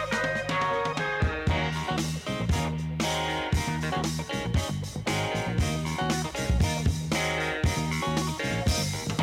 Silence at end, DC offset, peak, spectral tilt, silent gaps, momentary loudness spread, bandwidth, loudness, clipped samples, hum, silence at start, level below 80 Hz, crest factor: 0 s; under 0.1%; -14 dBFS; -4.5 dB/octave; none; 3 LU; 16 kHz; -28 LUFS; under 0.1%; none; 0 s; -36 dBFS; 12 dB